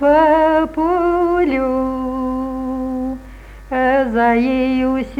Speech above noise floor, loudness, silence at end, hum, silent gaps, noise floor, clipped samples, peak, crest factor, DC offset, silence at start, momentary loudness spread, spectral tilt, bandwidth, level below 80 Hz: 22 dB; -17 LUFS; 0 s; 50 Hz at -40 dBFS; none; -36 dBFS; under 0.1%; -2 dBFS; 14 dB; under 0.1%; 0 s; 10 LU; -7 dB/octave; 8.2 kHz; -38 dBFS